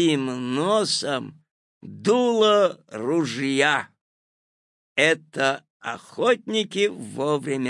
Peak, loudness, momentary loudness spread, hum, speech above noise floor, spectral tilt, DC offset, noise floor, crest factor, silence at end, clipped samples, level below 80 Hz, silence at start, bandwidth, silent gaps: -4 dBFS; -23 LUFS; 13 LU; none; over 68 dB; -4 dB/octave; under 0.1%; under -90 dBFS; 18 dB; 0 s; under 0.1%; -76 dBFS; 0 s; 11.5 kHz; 1.51-1.81 s, 4.01-4.96 s, 5.70-5.80 s